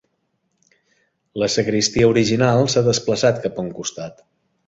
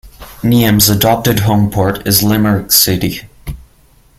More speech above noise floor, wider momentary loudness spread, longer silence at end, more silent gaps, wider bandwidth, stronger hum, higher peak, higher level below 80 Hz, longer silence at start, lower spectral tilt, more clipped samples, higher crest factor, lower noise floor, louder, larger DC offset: first, 52 dB vs 36 dB; about the same, 13 LU vs 15 LU; about the same, 0.55 s vs 0.6 s; neither; second, 8 kHz vs over 20 kHz; neither; about the same, -2 dBFS vs 0 dBFS; second, -48 dBFS vs -34 dBFS; first, 1.35 s vs 0.05 s; about the same, -4.5 dB/octave vs -4.5 dB/octave; neither; first, 18 dB vs 12 dB; first, -70 dBFS vs -47 dBFS; second, -18 LUFS vs -11 LUFS; neither